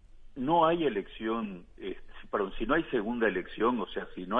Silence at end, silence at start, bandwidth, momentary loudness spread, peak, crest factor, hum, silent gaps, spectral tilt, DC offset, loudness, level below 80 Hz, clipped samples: 0 s; 0 s; 4.5 kHz; 16 LU; -12 dBFS; 20 dB; none; none; -8 dB/octave; under 0.1%; -30 LUFS; -48 dBFS; under 0.1%